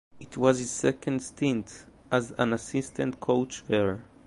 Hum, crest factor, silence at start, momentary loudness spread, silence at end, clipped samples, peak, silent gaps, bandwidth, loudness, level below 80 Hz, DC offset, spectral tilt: none; 20 dB; 0.15 s; 7 LU; 0.25 s; under 0.1%; -8 dBFS; none; 11.5 kHz; -28 LUFS; -58 dBFS; under 0.1%; -5 dB/octave